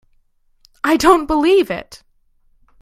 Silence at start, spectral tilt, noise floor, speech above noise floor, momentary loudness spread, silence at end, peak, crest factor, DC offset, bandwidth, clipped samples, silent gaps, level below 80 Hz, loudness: 0.85 s; -4 dB/octave; -57 dBFS; 43 dB; 11 LU; 0.85 s; 0 dBFS; 18 dB; under 0.1%; 15.5 kHz; under 0.1%; none; -42 dBFS; -15 LUFS